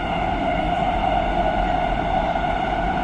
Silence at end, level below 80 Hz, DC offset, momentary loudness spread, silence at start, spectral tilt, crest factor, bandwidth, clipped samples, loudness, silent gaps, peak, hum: 0 s; -30 dBFS; under 0.1%; 2 LU; 0 s; -7 dB/octave; 12 dB; 9 kHz; under 0.1%; -22 LUFS; none; -8 dBFS; none